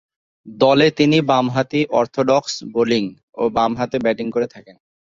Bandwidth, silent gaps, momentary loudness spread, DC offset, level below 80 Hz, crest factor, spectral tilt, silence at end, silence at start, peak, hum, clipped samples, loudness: 7.6 kHz; 3.23-3.33 s; 9 LU; under 0.1%; -56 dBFS; 16 dB; -5.5 dB/octave; 0.4 s; 0.45 s; -2 dBFS; none; under 0.1%; -18 LUFS